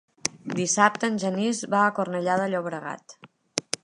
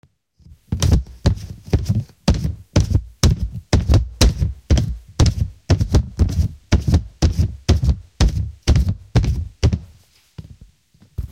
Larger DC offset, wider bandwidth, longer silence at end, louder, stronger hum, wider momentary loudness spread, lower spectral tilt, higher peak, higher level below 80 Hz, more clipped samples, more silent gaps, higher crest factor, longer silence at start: neither; second, 11.5 kHz vs 16 kHz; first, 0.25 s vs 0.05 s; second, -25 LUFS vs -20 LUFS; neither; first, 12 LU vs 6 LU; second, -3.5 dB/octave vs -6 dB/octave; about the same, 0 dBFS vs 0 dBFS; second, -74 dBFS vs -22 dBFS; neither; neither; first, 26 dB vs 18 dB; second, 0.25 s vs 0.7 s